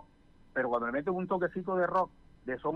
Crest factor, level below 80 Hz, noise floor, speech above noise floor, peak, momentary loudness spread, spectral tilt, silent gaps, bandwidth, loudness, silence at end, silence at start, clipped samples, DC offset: 14 dB; -62 dBFS; -60 dBFS; 28 dB; -20 dBFS; 8 LU; -8.5 dB/octave; none; 6.4 kHz; -33 LUFS; 0 s; 0.55 s; under 0.1%; under 0.1%